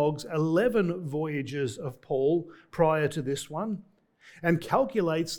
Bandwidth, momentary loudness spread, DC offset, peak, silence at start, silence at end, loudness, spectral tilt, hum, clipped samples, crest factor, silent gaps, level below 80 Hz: 19 kHz; 9 LU; under 0.1%; -10 dBFS; 0 s; 0 s; -28 LUFS; -6.5 dB/octave; none; under 0.1%; 18 dB; none; -60 dBFS